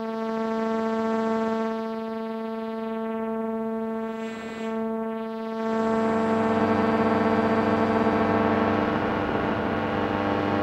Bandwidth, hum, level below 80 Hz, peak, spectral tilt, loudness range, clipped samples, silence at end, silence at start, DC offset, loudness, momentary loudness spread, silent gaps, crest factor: 8.6 kHz; none; -52 dBFS; -8 dBFS; -7.5 dB/octave; 7 LU; under 0.1%; 0 s; 0 s; under 0.1%; -26 LUFS; 9 LU; none; 18 dB